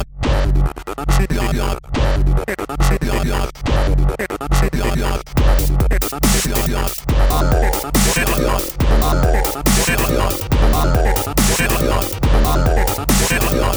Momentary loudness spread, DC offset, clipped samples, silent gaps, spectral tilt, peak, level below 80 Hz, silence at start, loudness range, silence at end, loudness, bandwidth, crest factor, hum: 5 LU; under 0.1%; under 0.1%; none; -4.5 dB/octave; -2 dBFS; -18 dBFS; 0 s; 3 LU; 0 s; -17 LUFS; over 20 kHz; 14 dB; none